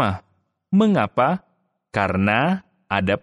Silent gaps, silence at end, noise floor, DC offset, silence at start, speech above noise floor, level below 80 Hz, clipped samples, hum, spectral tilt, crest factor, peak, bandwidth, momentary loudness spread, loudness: none; 0.05 s; -66 dBFS; under 0.1%; 0 s; 48 dB; -56 dBFS; under 0.1%; none; -7.5 dB/octave; 18 dB; -4 dBFS; 10.5 kHz; 10 LU; -21 LUFS